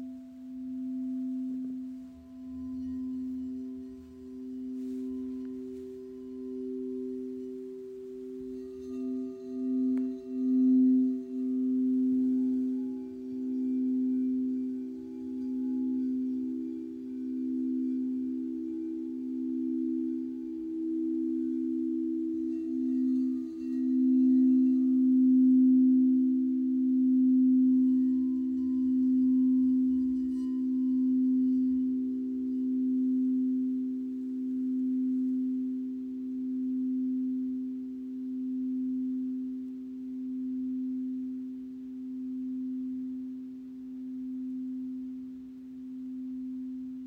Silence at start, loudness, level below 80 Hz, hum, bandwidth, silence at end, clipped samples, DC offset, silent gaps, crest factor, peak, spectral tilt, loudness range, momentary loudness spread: 0 s; -30 LUFS; -68 dBFS; none; 1.3 kHz; 0 s; under 0.1%; under 0.1%; none; 12 dB; -18 dBFS; -9 dB/octave; 14 LU; 16 LU